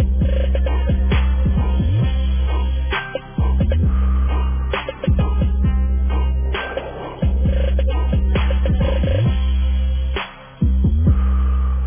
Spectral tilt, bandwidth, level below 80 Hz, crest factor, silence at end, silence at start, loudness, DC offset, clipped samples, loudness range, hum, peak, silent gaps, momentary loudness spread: -11 dB/octave; 3.6 kHz; -18 dBFS; 10 dB; 0 s; 0 s; -19 LUFS; under 0.1%; under 0.1%; 1 LU; none; -6 dBFS; none; 5 LU